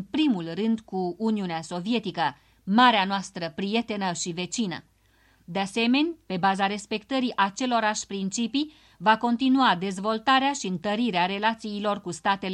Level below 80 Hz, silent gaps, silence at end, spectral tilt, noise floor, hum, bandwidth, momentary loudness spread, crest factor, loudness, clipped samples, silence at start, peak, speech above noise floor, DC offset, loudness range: -64 dBFS; none; 0 s; -4 dB/octave; -62 dBFS; none; 11 kHz; 9 LU; 20 dB; -25 LUFS; under 0.1%; 0 s; -6 dBFS; 37 dB; under 0.1%; 3 LU